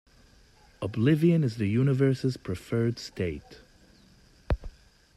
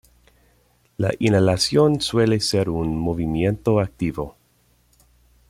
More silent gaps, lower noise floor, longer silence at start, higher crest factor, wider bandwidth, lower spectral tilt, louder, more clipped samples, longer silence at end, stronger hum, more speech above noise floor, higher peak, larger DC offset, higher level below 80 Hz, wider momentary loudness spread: neither; about the same, -58 dBFS vs -61 dBFS; second, 0.8 s vs 1 s; about the same, 16 dB vs 18 dB; second, 13 kHz vs 15.5 kHz; first, -8 dB/octave vs -5.5 dB/octave; second, -27 LUFS vs -20 LUFS; neither; second, 0.45 s vs 1.2 s; second, none vs 60 Hz at -50 dBFS; second, 32 dB vs 41 dB; second, -12 dBFS vs -4 dBFS; neither; about the same, -44 dBFS vs -44 dBFS; first, 12 LU vs 9 LU